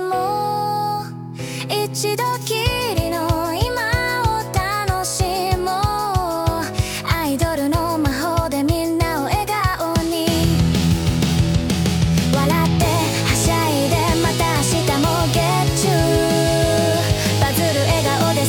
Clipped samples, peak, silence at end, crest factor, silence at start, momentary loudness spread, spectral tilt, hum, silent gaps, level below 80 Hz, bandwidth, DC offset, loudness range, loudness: under 0.1%; -2 dBFS; 0 s; 16 dB; 0 s; 4 LU; -5 dB/octave; none; none; -32 dBFS; 18 kHz; under 0.1%; 3 LU; -18 LUFS